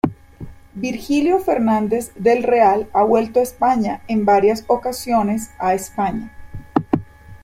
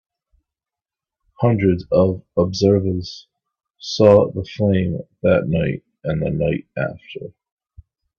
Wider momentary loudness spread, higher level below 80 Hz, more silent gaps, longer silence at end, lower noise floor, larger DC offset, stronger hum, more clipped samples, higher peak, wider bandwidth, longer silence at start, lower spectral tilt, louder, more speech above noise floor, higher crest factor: second, 10 LU vs 19 LU; about the same, -46 dBFS vs -46 dBFS; neither; second, 0.05 s vs 0.9 s; second, -37 dBFS vs -89 dBFS; neither; neither; neither; about the same, 0 dBFS vs 0 dBFS; first, 16 kHz vs 7 kHz; second, 0.05 s vs 1.4 s; second, -6 dB/octave vs -7.5 dB/octave; about the same, -18 LUFS vs -19 LUFS; second, 20 dB vs 71 dB; about the same, 18 dB vs 20 dB